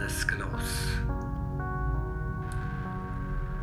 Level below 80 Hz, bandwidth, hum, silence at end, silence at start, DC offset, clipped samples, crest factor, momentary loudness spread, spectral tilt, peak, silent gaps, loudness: -34 dBFS; 15 kHz; none; 0 s; 0 s; under 0.1%; under 0.1%; 20 dB; 5 LU; -5 dB/octave; -12 dBFS; none; -33 LUFS